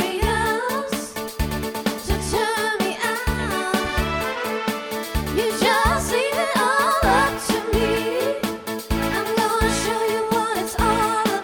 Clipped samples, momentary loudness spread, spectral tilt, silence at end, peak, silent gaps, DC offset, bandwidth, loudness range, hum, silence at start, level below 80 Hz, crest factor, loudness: under 0.1%; 8 LU; -4 dB/octave; 0 s; -6 dBFS; none; under 0.1%; 19.5 kHz; 4 LU; none; 0 s; -32 dBFS; 16 dB; -22 LUFS